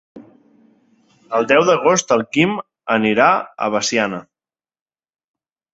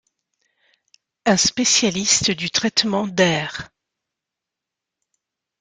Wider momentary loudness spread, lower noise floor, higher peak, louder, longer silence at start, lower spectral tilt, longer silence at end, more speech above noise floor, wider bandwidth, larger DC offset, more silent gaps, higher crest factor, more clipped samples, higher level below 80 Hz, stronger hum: about the same, 9 LU vs 8 LU; first, under -90 dBFS vs -85 dBFS; about the same, 0 dBFS vs 0 dBFS; about the same, -16 LUFS vs -18 LUFS; second, 0.15 s vs 1.25 s; first, -4 dB/octave vs -2.5 dB/octave; second, 1.55 s vs 1.95 s; first, over 74 dB vs 66 dB; second, 8 kHz vs 11 kHz; neither; neither; about the same, 20 dB vs 22 dB; neither; about the same, -60 dBFS vs -56 dBFS; neither